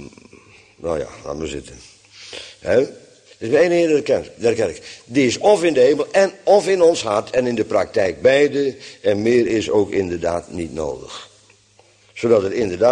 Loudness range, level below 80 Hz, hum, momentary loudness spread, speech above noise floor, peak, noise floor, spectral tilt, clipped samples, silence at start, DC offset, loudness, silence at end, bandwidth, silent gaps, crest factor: 6 LU; -50 dBFS; none; 15 LU; 36 dB; -2 dBFS; -53 dBFS; -5 dB/octave; under 0.1%; 0 s; under 0.1%; -18 LUFS; 0 s; 10 kHz; none; 16 dB